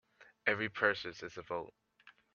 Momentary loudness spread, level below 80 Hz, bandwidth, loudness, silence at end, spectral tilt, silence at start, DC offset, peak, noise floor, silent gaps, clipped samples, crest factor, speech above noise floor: 13 LU; -76 dBFS; 7.2 kHz; -36 LUFS; 0.25 s; -1.5 dB/octave; 0.2 s; under 0.1%; -14 dBFS; -65 dBFS; none; under 0.1%; 24 dB; 28 dB